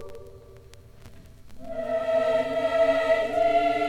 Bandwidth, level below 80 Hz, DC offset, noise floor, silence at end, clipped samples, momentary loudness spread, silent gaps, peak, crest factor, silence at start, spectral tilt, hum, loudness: 11 kHz; -52 dBFS; under 0.1%; -48 dBFS; 0 s; under 0.1%; 20 LU; none; -12 dBFS; 14 dB; 0 s; -5 dB/octave; none; -24 LUFS